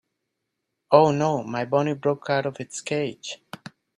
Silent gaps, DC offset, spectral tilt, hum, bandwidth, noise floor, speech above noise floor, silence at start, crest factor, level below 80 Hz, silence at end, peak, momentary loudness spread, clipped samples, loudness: none; under 0.1%; -5.5 dB/octave; none; 11.5 kHz; -80 dBFS; 57 dB; 0.9 s; 24 dB; -68 dBFS; 0.6 s; -2 dBFS; 18 LU; under 0.1%; -23 LUFS